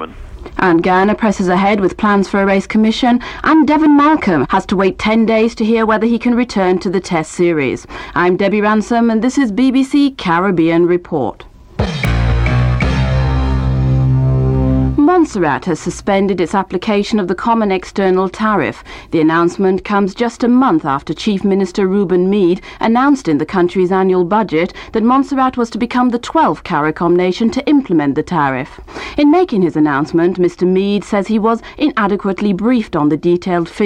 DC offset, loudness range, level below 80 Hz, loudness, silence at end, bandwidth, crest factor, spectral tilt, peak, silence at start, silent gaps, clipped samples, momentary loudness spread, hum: under 0.1%; 3 LU; -28 dBFS; -14 LUFS; 0 s; 10.5 kHz; 12 dB; -7 dB/octave; 0 dBFS; 0 s; none; under 0.1%; 5 LU; none